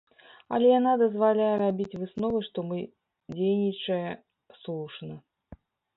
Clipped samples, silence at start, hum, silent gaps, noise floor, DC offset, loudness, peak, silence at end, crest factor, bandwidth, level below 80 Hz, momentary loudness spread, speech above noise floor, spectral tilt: under 0.1%; 0.5 s; none; none; -53 dBFS; under 0.1%; -27 LUFS; -12 dBFS; 0.4 s; 16 dB; 4.1 kHz; -64 dBFS; 20 LU; 27 dB; -9 dB/octave